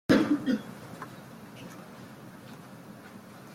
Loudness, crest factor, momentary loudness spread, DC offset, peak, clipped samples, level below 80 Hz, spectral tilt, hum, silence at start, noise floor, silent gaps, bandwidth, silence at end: -30 LUFS; 24 dB; 21 LU; under 0.1%; -10 dBFS; under 0.1%; -66 dBFS; -6 dB/octave; none; 0.1 s; -48 dBFS; none; 16.5 kHz; 0 s